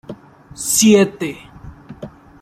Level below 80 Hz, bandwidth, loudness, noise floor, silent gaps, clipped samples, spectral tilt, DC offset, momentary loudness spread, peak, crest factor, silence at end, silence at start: -48 dBFS; 16 kHz; -15 LUFS; -37 dBFS; none; under 0.1%; -3.5 dB/octave; under 0.1%; 25 LU; -2 dBFS; 16 dB; 0.35 s; 0.1 s